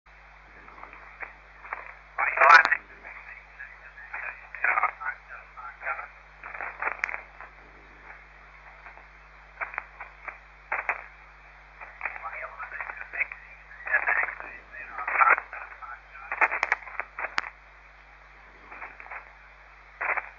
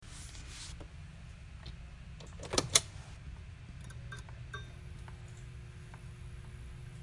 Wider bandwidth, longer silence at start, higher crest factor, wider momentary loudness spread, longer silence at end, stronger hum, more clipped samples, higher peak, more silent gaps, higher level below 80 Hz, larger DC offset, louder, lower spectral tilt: second, 7.2 kHz vs 11.5 kHz; first, 0.55 s vs 0 s; second, 24 dB vs 36 dB; first, 23 LU vs 20 LU; about the same, 0.05 s vs 0 s; neither; neither; about the same, -6 dBFS vs -6 dBFS; neither; about the same, -56 dBFS vs -52 dBFS; neither; first, -26 LUFS vs -39 LUFS; second, 1.5 dB/octave vs -2 dB/octave